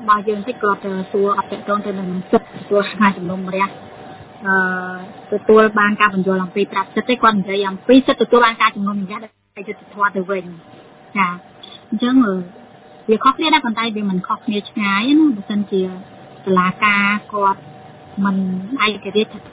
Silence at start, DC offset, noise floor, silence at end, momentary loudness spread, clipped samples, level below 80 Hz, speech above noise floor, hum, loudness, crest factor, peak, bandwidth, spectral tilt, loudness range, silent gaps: 0 s; under 0.1%; -42 dBFS; 0 s; 17 LU; under 0.1%; -58 dBFS; 25 dB; none; -17 LUFS; 18 dB; 0 dBFS; 4 kHz; -9.5 dB/octave; 5 LU; none